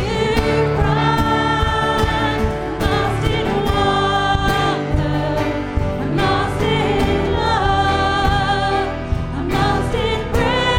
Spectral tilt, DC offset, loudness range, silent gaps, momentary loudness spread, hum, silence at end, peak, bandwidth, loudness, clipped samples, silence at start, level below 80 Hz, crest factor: -6 dB/octave; under 0.1%; 1 LU; none; 5 LU; none; 0 s; -2 dBFS; 17.5 kHz; -18 LUFS; under 0.1%; 0 s; -26 dBFS; 16 dB